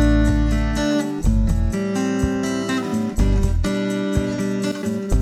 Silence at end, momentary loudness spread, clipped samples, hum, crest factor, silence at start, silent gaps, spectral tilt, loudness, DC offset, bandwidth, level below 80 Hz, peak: 0 s; 4 LU; under 0.1%; none; 14 dB; 0 s; none; -6.5 dB/octave; -21 LUFS; under 0.1%; 13 kHz; -22 dBFS; -4 dBFS